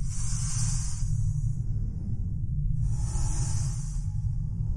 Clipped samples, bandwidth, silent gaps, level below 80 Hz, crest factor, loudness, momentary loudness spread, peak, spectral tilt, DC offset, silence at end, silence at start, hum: under 0.1%; 11.5 kHz; none; -32 dBFS; 12 dB; -31 LUFS; 4 LU; -14 dBFS; -5 dB/octave; under 0.1%; 0 s; 0 s; none